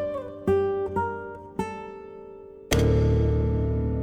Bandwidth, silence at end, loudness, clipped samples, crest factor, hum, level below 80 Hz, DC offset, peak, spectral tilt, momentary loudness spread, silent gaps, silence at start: 19 kHz; 0 s; -26 LUFS; under 0.1%; 18 dB; none; -32 dBFS; under 0.1%; -8 dBFS; -7 dB/octave; 20 LU; none; 0 s